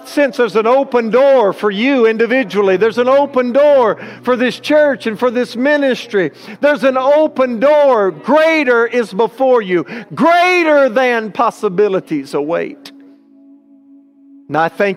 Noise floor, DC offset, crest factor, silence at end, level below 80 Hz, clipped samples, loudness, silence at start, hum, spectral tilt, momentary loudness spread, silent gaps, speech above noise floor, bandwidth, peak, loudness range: -44 dBFS; under 0.1%; 12 dB; 0 s; -66 dBFS; under 0.1%; -13 LUFS; 0 s; none; -5.5 dB/octave; 8 LU; none; 32 dB; 13.5 kHz; -2 dBFS; 4 LU